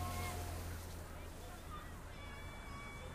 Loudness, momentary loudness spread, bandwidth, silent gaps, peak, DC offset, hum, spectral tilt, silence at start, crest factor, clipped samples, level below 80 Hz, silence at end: -48 LUFS; 8 LU; 15.5 kHz; none; -30 dBFS; under 0.1%; none; -4.5 dB/octave; 0 s; 16 dB; under 0.1%; -52 dBFS; 0 s